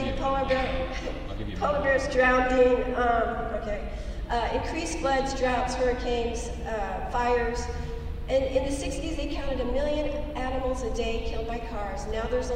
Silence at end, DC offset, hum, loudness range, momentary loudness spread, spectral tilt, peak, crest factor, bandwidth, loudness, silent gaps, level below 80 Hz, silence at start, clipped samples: 0 s; under 0.1%; none; 5 LU; 12 LU; -5 dB/octave; -10 dBFS; 16 dB; 11 kHz; -28 LUFS; none; -34 dBFS; 0 s; under 0.1%